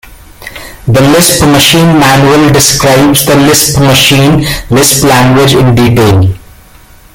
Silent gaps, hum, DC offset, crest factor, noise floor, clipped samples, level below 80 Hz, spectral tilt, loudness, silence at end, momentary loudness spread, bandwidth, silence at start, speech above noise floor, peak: none; none; under 0.1%; 6 dB; -35 dBFS; 1%; -28 dBFS; -4 dB/octave; -5 LUFS; 0.75 s; 7 LU; over 20 kHz; 0.4 s; 31 dB; 0 dBFS